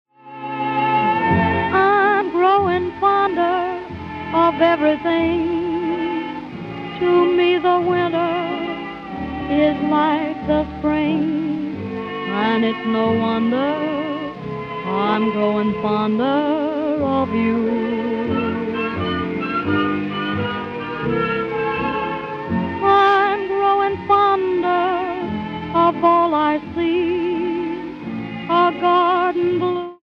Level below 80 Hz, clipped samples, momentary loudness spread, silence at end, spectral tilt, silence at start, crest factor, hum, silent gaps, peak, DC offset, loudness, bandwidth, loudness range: -48 dBFS; under 0.1%; 11 LU; 0.1 s; -8 dB/octave; 0.25 s; 16 dB; none; none; -2 dBFS; under 0.1%; -19 LUFS; 6.2 kHz; 4 LU